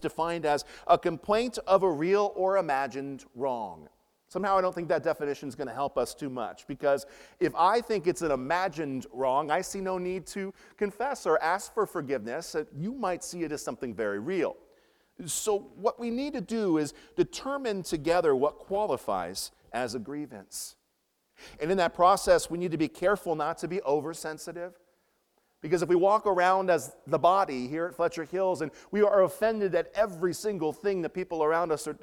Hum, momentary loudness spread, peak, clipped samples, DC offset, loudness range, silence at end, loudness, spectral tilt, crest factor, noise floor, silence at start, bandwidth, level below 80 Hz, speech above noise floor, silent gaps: none; 12 LU; -8 dBFS; under 0.1%; under 0.1%; 5 LU; 0.1 s; -29 LUFS; -4.5 dB/octave; 20 dB; -76 dBFS; 0 s; 17.5 kHz; -60 dBFS; 47 dB; none